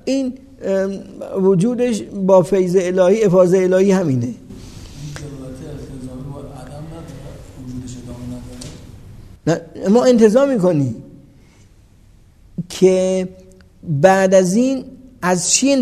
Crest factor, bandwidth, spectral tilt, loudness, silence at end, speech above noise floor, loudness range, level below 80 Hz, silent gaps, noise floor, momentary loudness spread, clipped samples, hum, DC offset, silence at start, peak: 18 dB; 13.5 kHz; -5.5 dB/octave; -15 LUFS; 0 s; 33 dB; 17 LU; -46 dBFS; none; -47 dBFS; 21 LU; under 0.1%; none; under 0.1%; 0.05 s; 0 dBFS